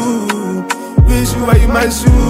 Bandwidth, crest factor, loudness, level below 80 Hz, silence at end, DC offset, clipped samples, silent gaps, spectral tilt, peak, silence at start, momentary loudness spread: 16 kHz; 10 dB; -13 LUFS; -14 dBFS; 0 s; under 0.1%; 0.9%; none; -6 dB/octave; 0 dBFS; 0 s; 8 LU